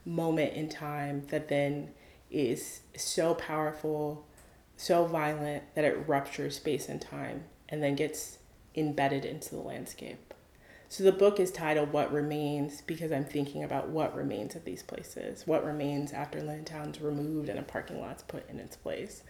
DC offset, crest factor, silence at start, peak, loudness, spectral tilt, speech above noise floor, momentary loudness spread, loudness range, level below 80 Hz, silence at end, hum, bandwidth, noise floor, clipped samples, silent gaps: under 0.1%; 22 dB; 0.05 s; -12 dBFS; -33 LUFS; -5.5 dB/octave; 25 dB; 13 LU; 5 LU; -62 dBFS; 0 s; none; 19.5 kHz; -58 dBFS; under 0.1%; none